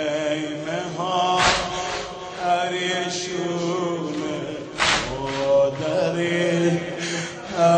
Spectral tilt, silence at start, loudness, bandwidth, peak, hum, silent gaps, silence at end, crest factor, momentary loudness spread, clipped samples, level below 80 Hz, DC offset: -4 dB/octave; 0 s; -23 LUFS; 9.6 kHz; -6 dBFS; none; none; 0 s; 18 dB; 9 LU; under 0.1%; -48 dBFS; under 0.1%